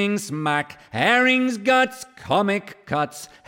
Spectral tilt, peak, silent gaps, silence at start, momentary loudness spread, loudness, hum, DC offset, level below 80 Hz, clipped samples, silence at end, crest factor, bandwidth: -4.5 dB/octave; -4 dBFS; none; 0 s; 11 LU; -21 LUFS; none; under 0.1%; -62 dBFS; under 0.1%; 0.2 s; 18 dB; 16.5 kHz